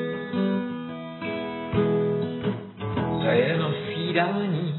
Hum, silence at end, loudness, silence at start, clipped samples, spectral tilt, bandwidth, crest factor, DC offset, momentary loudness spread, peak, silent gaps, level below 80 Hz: none; 0 s; -26 LUFS; 0 s; under 0.1%; -5.5 dB/octave; 4.2 kHz; 18 dB; under 0.1%; 10 LU; -8 dBFS; none; -56 dBFS